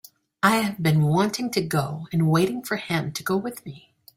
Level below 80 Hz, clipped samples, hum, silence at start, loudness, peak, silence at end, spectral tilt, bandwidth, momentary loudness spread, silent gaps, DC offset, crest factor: -60 dBFS; under 0.1%; none; 0.45 s; -23 LUFS; -4 dBFS; 0.4 s; -5.5 dB/octave; 16.5 kHz; 8 LU; none; under 0.1%; 20 dB